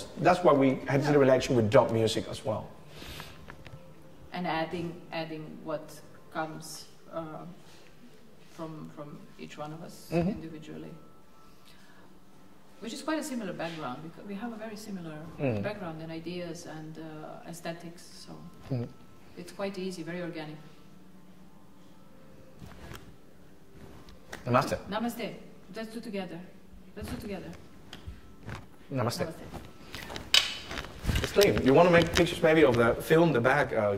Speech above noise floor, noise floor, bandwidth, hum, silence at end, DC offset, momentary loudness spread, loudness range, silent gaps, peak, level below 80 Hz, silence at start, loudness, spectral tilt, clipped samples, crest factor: 28 dB; -57 dBFS; 16 kHz; none; 0 s; 0.3%; 24 LU; 16 LU; none; -6 dBFS; -52 dBFS; 0 s; -29 LUFS; -5 dB/octave; under 0.1%; 26 dB